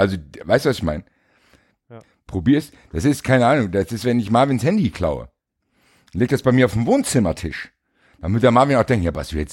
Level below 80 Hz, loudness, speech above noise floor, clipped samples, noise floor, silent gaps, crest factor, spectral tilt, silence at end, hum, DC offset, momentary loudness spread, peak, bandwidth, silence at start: -40 dBFS; -19 LUFS; 50 dB; under 0.1%; -68 dBFS; none; 18 dB; -6.5 dB/octave; 0 s; none; under 0.1%; 15 LU; -2 dBFS; 17 kHz; 0 s